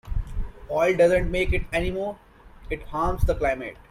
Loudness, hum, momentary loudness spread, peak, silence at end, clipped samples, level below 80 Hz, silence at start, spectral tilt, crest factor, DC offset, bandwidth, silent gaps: -25 LUFS; none; 15 LU; -8 dBFS; 0.15 s; under 0.1%; -32 dBFS; 0.05 s; -6.5 dB/octave; 16 dB; under 0.1%; 15.5 kHz; none